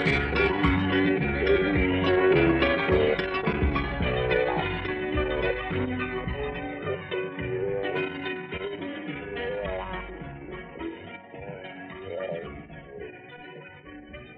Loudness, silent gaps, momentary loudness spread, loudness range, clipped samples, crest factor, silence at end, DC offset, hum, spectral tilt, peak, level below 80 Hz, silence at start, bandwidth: -27 LUFS; none; 19 LU; 15 LU; under 0.1%; 18 dB; 0 s; under 0.1%; none; -8 dB/octave; -10 dBFS; -38 dBFS; 0 s; 7.8 kHz